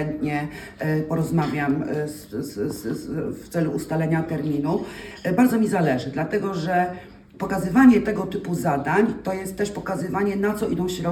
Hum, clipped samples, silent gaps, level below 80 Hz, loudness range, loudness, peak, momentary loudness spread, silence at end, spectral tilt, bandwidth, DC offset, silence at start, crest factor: none; under 0.1%; none; -50 dBFS; 5 LU; -23 LUFS; -4 dBFS; 10 LU; 0 s; -7 dB/octave; 18 kHz; under 0.1%; 0 s; 20 dB